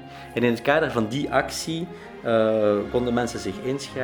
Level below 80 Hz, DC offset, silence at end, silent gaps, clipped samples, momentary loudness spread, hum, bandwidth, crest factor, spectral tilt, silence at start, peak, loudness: -50 dBFS; under 0.1%; 0 s; none; under 0.1%; 10 LU; none; over 20 kHz; 20 dB; -5 dB/octave; 0 s; -4 dBFS; -24 LUFS